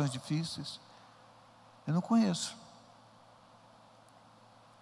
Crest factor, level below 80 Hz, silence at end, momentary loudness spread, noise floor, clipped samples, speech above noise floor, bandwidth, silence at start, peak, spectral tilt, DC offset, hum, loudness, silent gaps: 20 dB; -78 dBFS; 2.1 s; 27 LU; -60 dBFS; under 0.1%; 27 dB; 12 kHz; 0 s; -18 dBFS; -5.5 dB/octave; under 0.1%; none; -34 LUFS; none